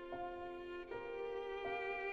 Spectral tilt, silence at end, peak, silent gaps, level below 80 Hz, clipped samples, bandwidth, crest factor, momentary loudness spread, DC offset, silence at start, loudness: -5.5 dB/octave; 0 s; -32 dBFS; none; -66 dBFS; under 0.1%; 7.6 kHz; 14 dB; 6 LU; under 0.1%; 0 s; -45 LUFS